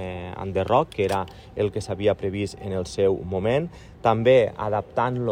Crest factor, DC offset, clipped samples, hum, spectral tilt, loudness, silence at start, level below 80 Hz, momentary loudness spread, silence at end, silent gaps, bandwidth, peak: 18 dB; under 0.1%; under 0.1%; none; -6.5 dB/octave; -24 LUFS; 0 s; -48 dBFS; 11 LU; 0 s; none; 15.5 kHz; -6 dBFS